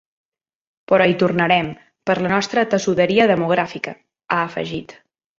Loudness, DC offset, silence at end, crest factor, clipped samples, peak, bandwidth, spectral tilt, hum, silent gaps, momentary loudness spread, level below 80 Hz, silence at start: -18 LUFS; under 0.1%; 0.45 s; 18 dB; under 0.1%; -2 dBFS; 7.8 kHz; -5.5 dB/octave; none; none; 14 LU; -56 dBFS; 0.9 s